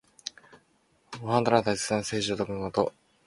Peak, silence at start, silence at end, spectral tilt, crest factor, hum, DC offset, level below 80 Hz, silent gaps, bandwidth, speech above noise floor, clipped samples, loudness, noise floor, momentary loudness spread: -6 dBFS; 0.25 s; 0.35 s; -4.5 dB/octave; 24 dB; none; under 0.1%; -60 dBFS; none; 11.5 kHz; 40 dB; under 0.1%; -28 LUFS; -67 dBFS; 17 LU